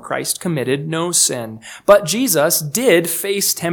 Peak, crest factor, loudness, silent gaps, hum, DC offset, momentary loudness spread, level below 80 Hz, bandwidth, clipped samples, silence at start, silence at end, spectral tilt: 0 dBFS; 16 dB; -16 LUFS; none; none; under 0.1%; 7 LU; -56 dBFS; 19.5 kHz; under 0.1%; 0.05 s; 0 s; -3 dB/octave